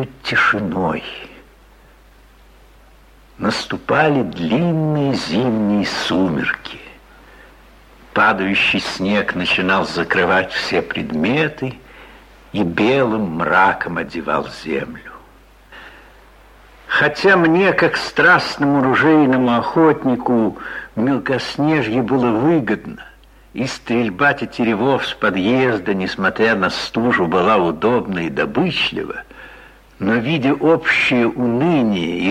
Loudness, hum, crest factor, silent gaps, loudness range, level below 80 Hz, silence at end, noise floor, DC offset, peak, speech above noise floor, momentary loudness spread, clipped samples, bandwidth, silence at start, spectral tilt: -17 LUFS; none; 16 dB; none; 6 LU; -48 dBFS; 0 s; -47 dBFS; under 0.1%; -2 dBFS; 30 dB; 10 LU; under 0.1%; 13.5 kHz; 0 s; -6 dB/octave